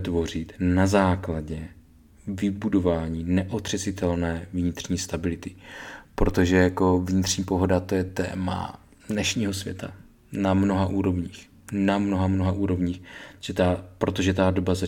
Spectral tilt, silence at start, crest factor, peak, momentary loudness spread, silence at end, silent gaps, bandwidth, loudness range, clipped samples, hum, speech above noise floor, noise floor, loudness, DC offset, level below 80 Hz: -6 dB/octave; 0 s; 20 dB; -6 dBFS; 16 LU; 0 s; none; 17 kHz; 3 LU; under 0.1%; none; 28 dB; -52 dBFS; -25 LUFS; under 0.1%; -42 dBFS